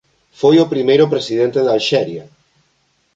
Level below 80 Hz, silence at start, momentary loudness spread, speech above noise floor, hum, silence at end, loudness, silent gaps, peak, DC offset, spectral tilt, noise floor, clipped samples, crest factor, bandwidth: -60 dBFS; 0.4 s; 6 LU; 48 dB; none; 0.95 s; -14 LUFS; none; -2 dBFS; under 0.1%; -6 dB/octave; -62 dBFS; under 0.1%; 14 dB; 7.8 kHz